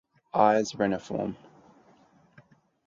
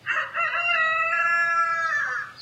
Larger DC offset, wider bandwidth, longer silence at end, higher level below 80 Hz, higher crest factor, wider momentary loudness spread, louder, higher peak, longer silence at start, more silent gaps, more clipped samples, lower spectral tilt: neither; second, 7.6 kHz vs 11 kHz; first, 1.5 s vs 0 s; first, -66 dBFS vs -72 dBFS; first, 22 dB vs 12 dB; first, 12 LU vs 5 LU; second, -27 LUFS vs -22 LUFS; first, -8 dBFS vs -12 dBFS; first, 0.35 s vs 0.05 s; neither; neither; first, -5.5 dB/octave vs -0.5 dB/octave